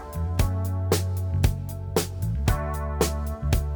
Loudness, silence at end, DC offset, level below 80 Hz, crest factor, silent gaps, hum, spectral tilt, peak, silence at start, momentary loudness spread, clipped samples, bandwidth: -27 LUFS; 0 s; under 0.1%; -30 dBFS; 20 dB; none; none; -5.5 dB/octave; -6 dBFS; 0 s; 4 LU; under 0.1%; over 20 kHz